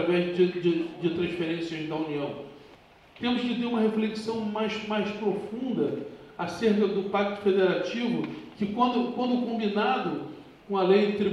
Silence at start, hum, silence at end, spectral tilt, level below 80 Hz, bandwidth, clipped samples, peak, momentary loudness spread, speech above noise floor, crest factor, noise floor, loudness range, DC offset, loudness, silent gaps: 0 s; none; 0 s; -7 dB/octave; -66 dBFS; 10.5 kHz; under 0.1%; -8 dBFS; 10 LU; 27 dB; 18 dB; -54 dBFS; 3 LU; under 0.1%; -28 LUFS; none